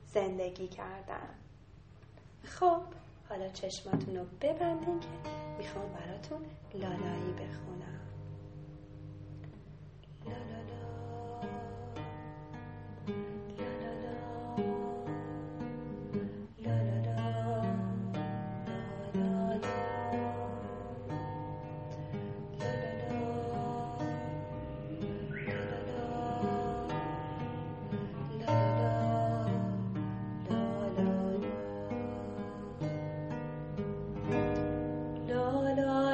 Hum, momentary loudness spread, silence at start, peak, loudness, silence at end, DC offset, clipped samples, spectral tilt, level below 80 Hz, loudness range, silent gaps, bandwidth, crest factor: none; 15 LU; 0 s; -16 dBFS; -37 LUFS; 0 s; under 0.1%; under 0.1%; -8 dB/octave; -56 dBFS; 10 LU; none; 8.4 kHz; 20 dB